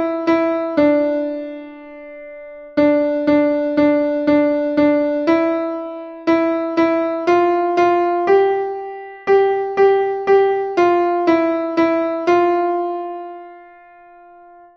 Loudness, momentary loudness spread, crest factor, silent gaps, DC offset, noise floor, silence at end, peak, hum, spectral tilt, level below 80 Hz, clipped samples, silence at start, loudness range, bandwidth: -16 LUFS; 16 LU; 14 dB; none; under 0.1%; -44 dBFS; 1.1 s; -2 dBFS; none; -6.5 dB/octave; -56 dBFS; under 0.1%; 0 s; 3 LU; 6.6 kHz